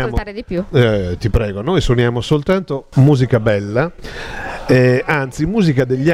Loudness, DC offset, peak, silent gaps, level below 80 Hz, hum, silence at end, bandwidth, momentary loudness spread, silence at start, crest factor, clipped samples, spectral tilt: -16 LUFS; under 0.1%; 0 dBFS; none; -30 dBFS; none; 0 s; 12 kHz; 11 LU; 0 s; 14 dB; under 0.1%; -7.5 dB/octave